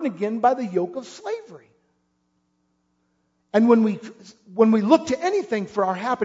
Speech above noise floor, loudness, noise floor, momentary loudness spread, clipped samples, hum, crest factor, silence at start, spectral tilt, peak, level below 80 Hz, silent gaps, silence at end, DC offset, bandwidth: 49 dB; -21 LUFS; -70 dBFS; 16 LU; under 0.1%; none; 20 dB; 0 s; -6.5 dB/octave; -4 dBFS; -68 dBFS; none; 0 s; under 0.1%; 7.8 kHz